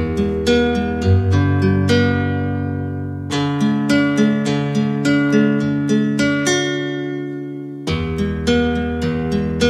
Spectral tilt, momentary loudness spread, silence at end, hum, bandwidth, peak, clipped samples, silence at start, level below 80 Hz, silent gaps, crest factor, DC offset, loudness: -6 dB/octave; 9 LU; 0 s; none; 12.5 kHz; -2 dBFS; under 0.1%; 0 s; -36 dBFS; none; 14 dB; under 0.1%; -18 LUFS